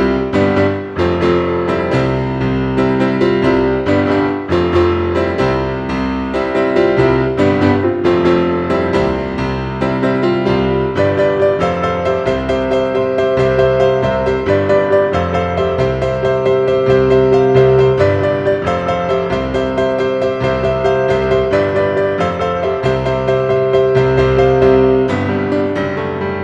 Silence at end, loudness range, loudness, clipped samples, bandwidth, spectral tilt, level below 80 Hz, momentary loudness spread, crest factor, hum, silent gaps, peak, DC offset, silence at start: 0 s; 2 LU; -14 LUFS; under 0.1%; 8 kHz; -7.5 dB/octave; -34 dBFS; 6 LU; 14 dB; none; none; 0 dBFS; under 0.1%; 0 s